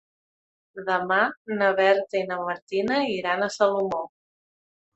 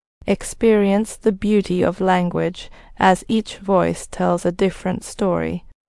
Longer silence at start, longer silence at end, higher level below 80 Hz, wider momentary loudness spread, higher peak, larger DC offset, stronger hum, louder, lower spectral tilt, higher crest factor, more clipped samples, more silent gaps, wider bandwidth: first, 0.75 s vs 0.25 s; first, 0.9 s vs 0.3 s; second, -70 dBFS vs -42 dBFS; about the same, 10 LU vs 8 LU; second, -6 dBFS vs 0 dBFS; neither; neither; second, -24 LUFS vs -19 LUFS; second, -4.5 dB/octave vs -6 dB/octave; about the same, 20 dB vs 18 dB; neither; first, 1.37-1.45 s, 2.62-2.67 s vs none; second, 8.2 kHz vs 12 kHz